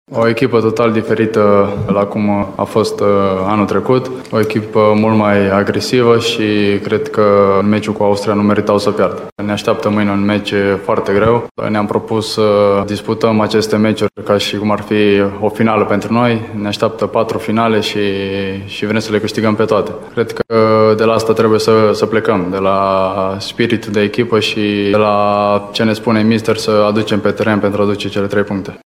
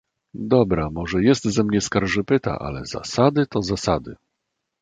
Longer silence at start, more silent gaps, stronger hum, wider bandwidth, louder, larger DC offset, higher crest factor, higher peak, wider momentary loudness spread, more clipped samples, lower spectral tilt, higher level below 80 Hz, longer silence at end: second, 0.1 s vs 0.35 s; first, 9.32-9.36 s, 11.51-11.55 s vs none; neither; first, 15 kHz vs 9.4 kHz; first, -13 LUFS vs -21 LUFS; neither; second, 12 dB vs 18 dB; about the same, 0 dBFS vs -2 dBFS; second, 6 LU vs 11 LU; neither; about the same, -6 dB/octave vs -5.5 dB/octave; second, -48 dBFS vs -42 dBFS; second, 0.15 s vs 0.65 s